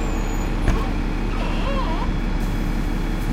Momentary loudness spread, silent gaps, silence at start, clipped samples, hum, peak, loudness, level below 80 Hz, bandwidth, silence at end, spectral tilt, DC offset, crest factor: 3 LU; none; 0 s; under 0.1%; none; -6 dBFS; -25 LUFS; -22 dBFS; 14.5 kHz; 0 s; -6 dB/octave; under 0.1%; 16 dB